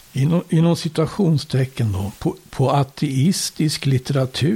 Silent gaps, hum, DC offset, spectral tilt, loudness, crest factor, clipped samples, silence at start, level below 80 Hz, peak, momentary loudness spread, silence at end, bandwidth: none; none; under 0.1%; -6 dB/octave; -20 LUFS; 12 dB; under 0.1%; 0.15 s; -48 dBFS; -6 dBFS; 5 LU; 0 s; 16.5 kHz